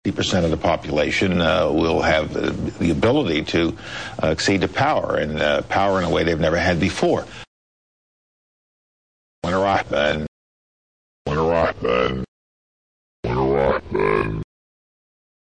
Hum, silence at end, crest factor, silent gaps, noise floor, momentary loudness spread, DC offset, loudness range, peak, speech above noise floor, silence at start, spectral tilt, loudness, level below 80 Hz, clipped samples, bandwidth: none; 1 s; 16 dB; 7.47-9.42 s, 10.28-11.25 s, 12.28-13.23 s; under -90 dBFS; 10 LU; 0.3%; 6 LU; -6 dBFS; over 70 dB; 0.05 s; -5.5 dB/octave; -20 LUFS; -40 dBFS; under 0.1%; 9.8 kHz